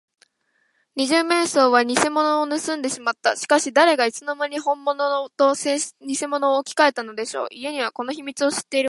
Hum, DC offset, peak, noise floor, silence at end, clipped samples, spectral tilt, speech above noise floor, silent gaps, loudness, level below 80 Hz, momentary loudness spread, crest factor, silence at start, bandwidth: none; under 0.1%; -2 dBFS; -68 dBFS; 0 s; under 0.1%; -1.5 dB/octave; 47 dB; none; -21 LUFS; -76 dBFS; 11 LU; 20 dB; 0.95 s; 11.5 kHz